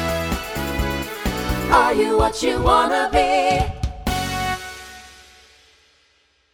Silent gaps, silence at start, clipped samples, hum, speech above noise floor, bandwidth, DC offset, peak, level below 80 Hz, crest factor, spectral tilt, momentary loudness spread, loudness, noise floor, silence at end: none; 0 s; under 0.1%; none; 44 dB; 19.5 kHz; under 0.1%; 0 dBFS; -32 dBFS; 20 dB; -4.5 dB/octave; 11 LU; -20 LUFS; -61 dBFS; 1.4 s